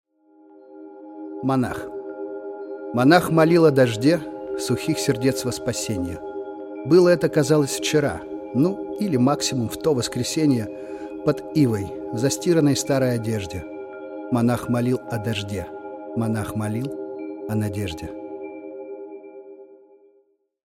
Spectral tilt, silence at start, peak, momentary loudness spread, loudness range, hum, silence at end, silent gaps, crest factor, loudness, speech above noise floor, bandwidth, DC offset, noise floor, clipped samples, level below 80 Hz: -5.5 dB/octave; 0.7 s; -2 dBFS; 18 LU; 9 LU; none; 1 s; none; 20 dB; -22 LUFS; 42 dB; 16.5 kHz; under 0.1%; -63 dBFS; under 0.1%; -56 dBFS